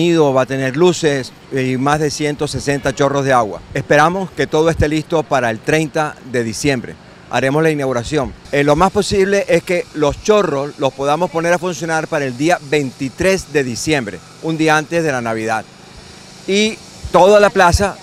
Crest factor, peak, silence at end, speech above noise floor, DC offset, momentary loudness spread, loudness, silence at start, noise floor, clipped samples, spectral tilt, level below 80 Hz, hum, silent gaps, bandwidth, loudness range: 16 dB; 0 dBFS; 0 s; 22 dB; under 0.1%; 8 LU; -15 LUFS; 0 s; -38 dBFS; under 0.1%; -5 dB/octave; -36 dBFS; none; none; 15.5 kHz; 3 LU